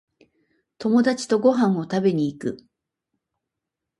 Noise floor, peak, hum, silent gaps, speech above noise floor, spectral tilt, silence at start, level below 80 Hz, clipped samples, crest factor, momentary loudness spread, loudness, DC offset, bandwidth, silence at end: -84 dBFS; -6 dBFS; none; none; 64 dB; -6.5 dB/octave; 0.8 s; -68 dBFS; under 0.1%; 18 dB; 13 LU; -22 LUFS; under 0.1%; 11.5 kHz; 1.45 s